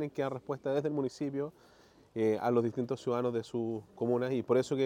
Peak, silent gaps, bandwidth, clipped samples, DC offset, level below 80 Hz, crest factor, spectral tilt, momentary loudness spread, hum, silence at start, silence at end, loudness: -16 dBFS; none; 16 kHz; under 0.1%; under 0.1%; -74 dBFS; 16 dB; -7 dB/octave; 7 LU; none; 0 s; 0 s; -33 LUFS